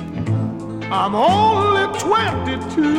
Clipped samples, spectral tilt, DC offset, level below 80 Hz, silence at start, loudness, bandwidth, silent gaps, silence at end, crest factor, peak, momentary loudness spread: under 0.1%; -5.5 dB/octave; under 0.1%; -44 dBFS; 0 s; -18 LUFS; 16 kHz; none; 0 s; 14 dB; -4 dBFS; 9 LU